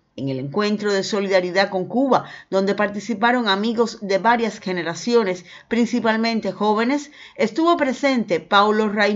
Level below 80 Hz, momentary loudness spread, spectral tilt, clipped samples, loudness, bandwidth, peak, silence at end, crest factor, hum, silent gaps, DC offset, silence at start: -64 dBFS; 7 LU; -5 dB/octave; under 0.1%; -20 LUFS; 7.8 kHz; 0 dBFS; 0 s; 20 dB; none; none; under 0.1%; 0.15 s